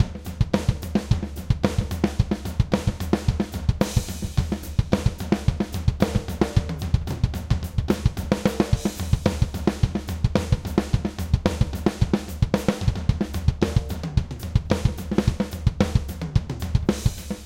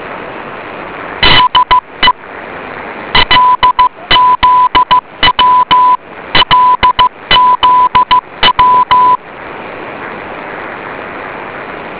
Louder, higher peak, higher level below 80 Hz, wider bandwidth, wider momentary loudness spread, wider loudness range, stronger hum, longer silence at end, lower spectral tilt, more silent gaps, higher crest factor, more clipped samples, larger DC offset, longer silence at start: second, -25 LUFS vs -7 LUFS; about the same, 0 dBFS vs 0 dBFS; about the same, -30 dBFS vs -32 dBFS; first, 17 kHz vs 4 kHz; second, 4 LU vs 17 LU; second, 1 LU vs 4 LU; neither; about the same, 0 s vs 0 s; about the same, -6.5 dB/octave vs -6.5 dB/octave; neither; first, 22 dB vs 10 dB; second, under 0.1% vs 0.3%; neither; about the same, 0 s vs 0 s